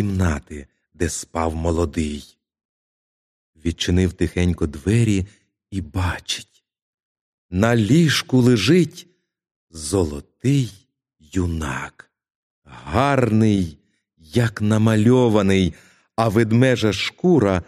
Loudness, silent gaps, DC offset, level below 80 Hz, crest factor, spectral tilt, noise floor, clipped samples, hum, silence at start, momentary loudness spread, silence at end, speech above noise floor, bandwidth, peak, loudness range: -20 LUFS; 2.65-3.53 s, 6.82-7.15 s, 7.21-7.49 s, 9.51-9.67 s, 12.35-12.62 s; under 0.1%; -40 dBFS; 20 dB; -6 dB/octave; -57 dBFS; under 0.1%; none; 0 s; 13 LU; 0.05 s; 39 dB; 14 kHz; -2 dBFS; 7 LU